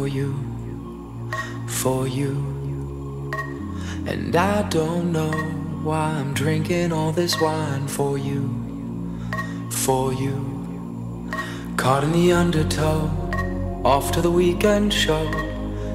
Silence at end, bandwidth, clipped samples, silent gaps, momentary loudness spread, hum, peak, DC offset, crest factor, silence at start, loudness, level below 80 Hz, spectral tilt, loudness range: 0 s; 16 kHz; under 0.1%; none; 12 LU; none; -4 dBFS; under 0.1%; 18 dB; 0 s; -23 LUFS; -36 dBFS; -5.5 dB/octave; 6 LU